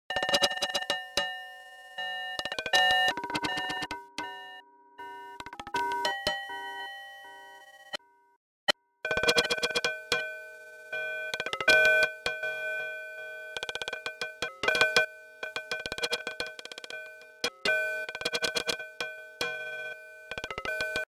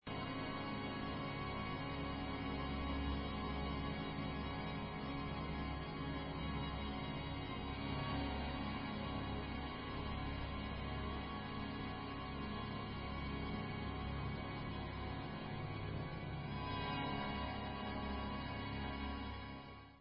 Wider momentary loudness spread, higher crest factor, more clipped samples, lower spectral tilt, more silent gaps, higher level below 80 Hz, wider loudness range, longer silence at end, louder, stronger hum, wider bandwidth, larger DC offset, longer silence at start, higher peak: first, 19 LU vs 4 LU; first, 26 dB vs 14 dB; neither; second, -1 dB/octave vs -4.5 dB/octave; first, 8.36-8.67 s vs none; second, -62 dBFS vs -50 dBFS; first, 8 LU vs 2 LU; about the same, 0.05 s vs 0 s; first, -29 LUFS vs -44 LUFS; neither; first, 16 kHz vs 5.4 kHz; neither; about the same, 0.1 s vs 0.05 s; first, -6 dBFS vs -30 dBFS